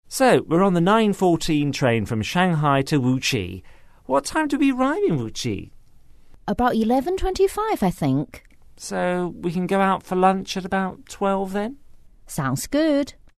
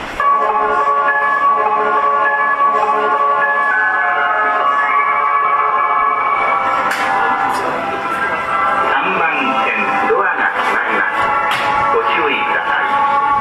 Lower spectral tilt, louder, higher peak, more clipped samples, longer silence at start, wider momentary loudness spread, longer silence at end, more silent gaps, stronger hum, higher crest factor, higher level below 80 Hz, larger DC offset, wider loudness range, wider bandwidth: first, -5.5 dB/octave vs -3.5 dB/octave; second, -21 LUFS vs -14 LUFS; about the same, -4 dBFS vs -4 dBFS; neither; about the same, 0.1 s vs 0 s; first, 10 LU vs 2 LU; first, 0.25 s vs 0 s; neither; neither; first, 18 dB vs 10 dB; first, -42 dBFS vs -50 dBFS; neither; about the same, 4 LU vs 2 LU; about the same, 13.5 kHz vs 13.5 kHz